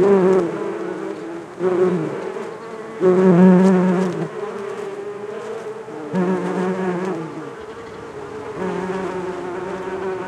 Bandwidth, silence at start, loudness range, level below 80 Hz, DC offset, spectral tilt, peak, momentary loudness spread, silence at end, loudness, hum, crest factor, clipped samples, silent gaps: 9.6 kHz; 0 s; 9 LU; -60 dBFS; under 0.1%; -8.5 dB/octave; -2 dBFS; 18 LU; 0 s; -20 LUFS; none; 18 dB; under 0.1%; none